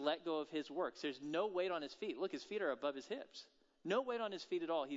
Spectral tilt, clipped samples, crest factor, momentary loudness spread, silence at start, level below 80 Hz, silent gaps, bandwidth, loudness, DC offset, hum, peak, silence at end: -2.5 dB/octave; under 0.1%; 18 dB; 9 LU; 0 s; -86 dBFS; none; 7.6 kHz; -42 LUFS; under 0.1%; none; -24 dBFS; 0 s